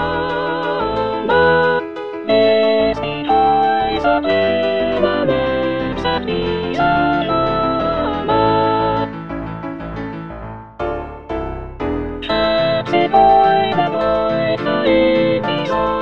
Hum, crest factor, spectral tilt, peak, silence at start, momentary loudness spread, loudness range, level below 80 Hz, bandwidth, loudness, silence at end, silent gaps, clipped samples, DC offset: none; 16 dB; -7.5 dB/octave; 0 dBFS; 0 s; 13 LU; 7 LU; -38 dBFS; 6.8 kHz; -16 LUFS; 0 s; none; under 0.1%; 0.6%